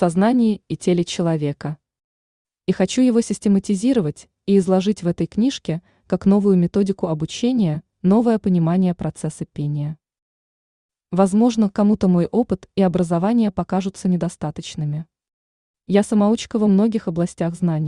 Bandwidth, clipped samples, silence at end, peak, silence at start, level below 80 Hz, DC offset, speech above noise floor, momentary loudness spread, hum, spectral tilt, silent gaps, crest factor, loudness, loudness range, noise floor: 11 kHz; under 0.1%; 0 s; -4 dBFS; 0 s; -52 dBFS; under 0.1%; over 72 dB; 11 LU; none; -7 dB/octave; 2.04-2.45 s, 10.22-10.89 s, 15.33-15.74 s; 16 dB; -19 LUFS; 3 LU; under -90 dBFS